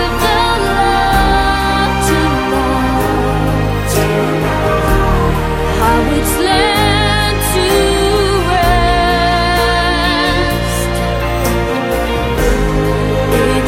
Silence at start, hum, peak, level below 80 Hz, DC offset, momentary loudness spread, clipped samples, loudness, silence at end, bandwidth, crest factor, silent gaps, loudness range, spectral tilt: 0 s; none; 0 dBFS; -20 dBFS; under 0.1%; 4 LU; under 0.1%; -13 LUFS; 0 s; 16.5 kHz; 12 dB; none; 2 LU; -5 dB/octave